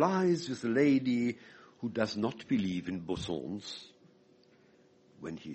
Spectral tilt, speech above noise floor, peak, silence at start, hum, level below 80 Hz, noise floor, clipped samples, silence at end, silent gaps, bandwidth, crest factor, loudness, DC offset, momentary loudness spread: -6 dB/octave; 32 dB; -14 dBFS; 0 s; none; -64 dBFS; -64 dBFS; under 0.1%; 0 s; none; 8.4 kHz; 20 dB; -32 LUFS; under 0.1%; 17 LU